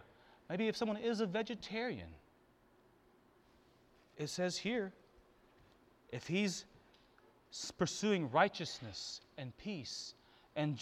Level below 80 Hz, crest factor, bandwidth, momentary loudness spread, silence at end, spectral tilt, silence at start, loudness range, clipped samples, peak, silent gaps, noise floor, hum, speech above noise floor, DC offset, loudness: -72 dBFS; 26 dB; 14 kHz; 14 LU; 0 s; -4.5 dB/octave; 0 s; 6 LU; under 0.1%; -16 dBFS; none; -69 dBFS; none; 30 dB; under 0.1%; -39 LUFS